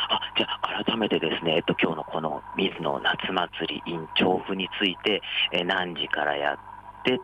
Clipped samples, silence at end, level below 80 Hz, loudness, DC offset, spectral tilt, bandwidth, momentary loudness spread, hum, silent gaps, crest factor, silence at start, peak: under 0.1%; 0 s; -60 dBFS; -26 LUFS; under 0.1%; -6 dB/octave; 11.5 kHz; 7 LU; none; none; 18 dB; 0 s; -10 dBFS